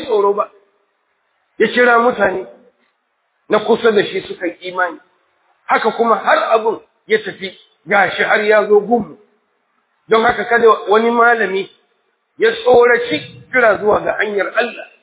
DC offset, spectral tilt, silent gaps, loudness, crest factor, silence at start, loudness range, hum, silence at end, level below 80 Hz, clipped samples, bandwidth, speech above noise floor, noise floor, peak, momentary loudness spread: under 0.1%; -8 dB/octave; none; -14 LUFS; 16 dB; 0 s; 4 LU; none; 0.2 s; -54 dBFS; under 0.1%; 4 kHz; 52 dB; -66 dBFS; 0 dBFS; 12 LU